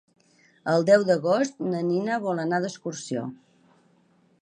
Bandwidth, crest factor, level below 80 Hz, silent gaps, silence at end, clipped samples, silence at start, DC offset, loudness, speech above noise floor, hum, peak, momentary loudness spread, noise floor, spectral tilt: 9.8 kHz; 20 dB; -74 dBFS; none; 1.05 s; under 0.1%; 0.65 s; under 0.1%; -25 LUFS; 39 dB; none; -6 dBFS; 13 LU; -63 dBFS; -6 dB/octave